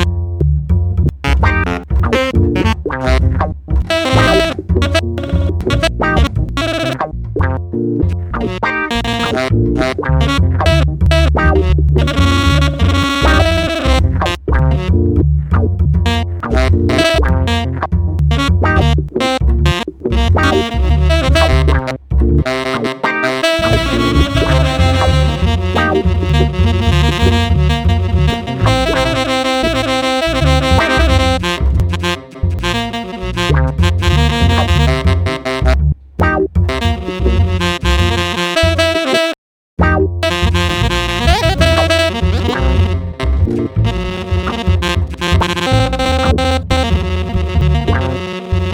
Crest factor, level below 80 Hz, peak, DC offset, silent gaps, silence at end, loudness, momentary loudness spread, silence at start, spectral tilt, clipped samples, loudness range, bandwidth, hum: 12 dB; -18 dBFS; 0 dBFS; under 0.1%; 39.38-39.77 s; 0 s; -14 LUFS; 6 LU; 0 s; -6 dB/octave; under 0.1%; 3 LU; 15.5 kHz; none